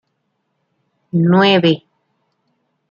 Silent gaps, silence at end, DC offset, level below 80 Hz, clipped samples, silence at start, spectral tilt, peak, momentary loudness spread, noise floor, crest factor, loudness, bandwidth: none; 1.15 s; under 0.1%; -62 dBFS; under 0.1%; 1.15 s; -7.5 dB/octave; -2 dBFS; 11 LU; -70 dBFS; 18 dB; -14 LUFS; 7 kHz